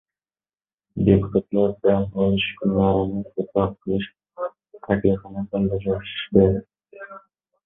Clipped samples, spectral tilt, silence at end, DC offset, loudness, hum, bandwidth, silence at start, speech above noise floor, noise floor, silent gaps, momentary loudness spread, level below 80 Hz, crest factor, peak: under 0.1%; -12 dB/octave; 0.5 s; under 0.1%; -22 LUFS; none; 3.9 kHz; 0.95 s; over 69 dB; under -90 dBFS; none; 14 LU; -42 dBFS; 20 dB; -2 dBFS